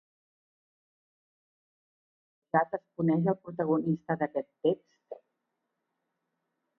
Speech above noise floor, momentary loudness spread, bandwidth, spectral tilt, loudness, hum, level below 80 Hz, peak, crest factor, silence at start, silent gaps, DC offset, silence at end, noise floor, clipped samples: 53 dB; 21 LU; 3.5 kHz; -10.5 dB/octave; -30 LUFS; none; -76 dBFS; -12 dBFS; 22 dB; 2.55 s; none; under 0.1%; 1.65 s; -83 dBFS; under 0.1%